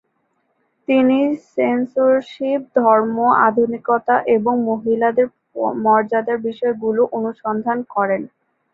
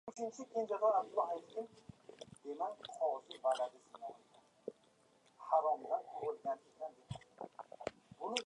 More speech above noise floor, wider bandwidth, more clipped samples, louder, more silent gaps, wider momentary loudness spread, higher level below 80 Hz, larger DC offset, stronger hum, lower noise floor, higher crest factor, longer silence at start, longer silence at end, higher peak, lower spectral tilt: first, 50 dB vs 32 dB; second, 6.6 kHz vs 11 kHz; neither; first, -18 LUFS vs -40 LUFS; neither; second, 8 LU vs 18 LU; first, -64 dBFS vs -78 dBFS; neither; neither; second, -67 dBFS vs -71 dBFS; second, 16 dB vs 24 dB; first, 0.9 s vs 0.05 s; first, 0.45 s vs 0 s; first, -2 dBFS vs -18 dBFS; first, -8 dB/octave vs -4 dB/octave